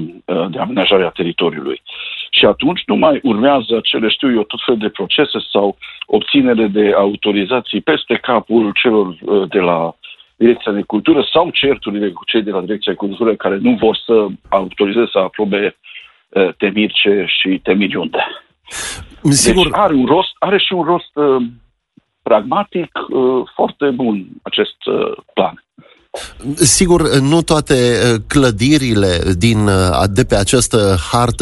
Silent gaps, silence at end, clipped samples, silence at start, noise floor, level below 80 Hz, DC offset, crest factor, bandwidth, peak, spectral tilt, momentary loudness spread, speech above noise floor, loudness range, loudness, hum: none; 0 s; under 0.1%; 0 s; -54 dBFS; -36 dBFS; under 0.1%; 14 dB; 12 kHz; 0 dBFS; -4.5 dB/octave; 8 LU; 40 dB; 4 LU; -14 LUFS; none